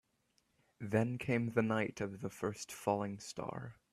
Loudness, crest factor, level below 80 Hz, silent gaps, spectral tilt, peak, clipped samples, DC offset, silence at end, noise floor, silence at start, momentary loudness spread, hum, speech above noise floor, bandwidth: -38 LUFS; 20 dB; -70 dBFS; none; -6 dB/octave; -18 dBFS; under 0.1%; under 0.1%; 0.2 s; -78 dBFS; 0.8 s; 10 LU; none; 41 dB; 14 kHz